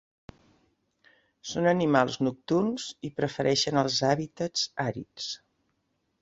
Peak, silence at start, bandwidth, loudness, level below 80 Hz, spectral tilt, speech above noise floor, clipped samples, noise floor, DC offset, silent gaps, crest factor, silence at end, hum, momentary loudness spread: -6 dBFS; 1.45 s; 8 kHz; -28 LUFS; -64 dBFS; -4.5 dB/octave; 49 dB; under 0.1%; -76 dBFS; under 0.1%; none; 22 dB; 0.85 s; none; 12 LU